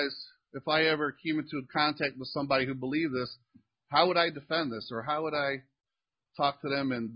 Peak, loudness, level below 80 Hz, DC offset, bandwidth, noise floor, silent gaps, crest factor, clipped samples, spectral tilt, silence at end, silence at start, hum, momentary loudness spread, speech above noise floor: -8 dBFS; -30 LUFS; -68 dBFS; under 0.1%; 5.4 kHz; under -90 dBFS; none; 24 dB; under 0.1%; -9 dB/octave; 0 s; 0 s; none; 11 LU; over 59 dB